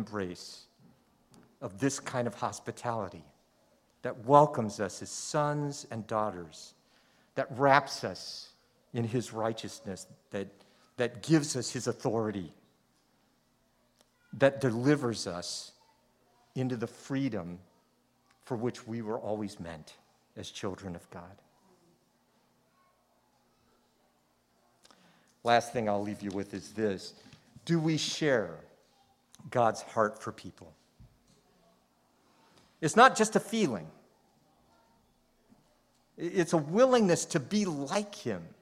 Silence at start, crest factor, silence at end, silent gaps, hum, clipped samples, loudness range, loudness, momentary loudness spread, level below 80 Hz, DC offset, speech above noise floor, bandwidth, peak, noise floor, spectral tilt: 0 s; 28 dB; 0.1 s; none; none; under 0.1%; 10 LU; -31 LUFS; 20 LU; -72 dBFS; under 0.1%; 40 dB; 15.5 kHz; -6 dBFS; -71 dBFS; -5 dB/octave